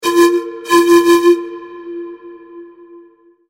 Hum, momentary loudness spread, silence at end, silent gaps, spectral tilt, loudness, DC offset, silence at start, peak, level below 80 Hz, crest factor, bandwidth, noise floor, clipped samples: none; 21 LU; 0.85 s; none; -3 dB/octave; -11 LUFS; under 0.1%; 0 s; -2 dBFS; -58 dBFS; 14 dB; 16.5 kHz; -46 dBFS; under 0.1%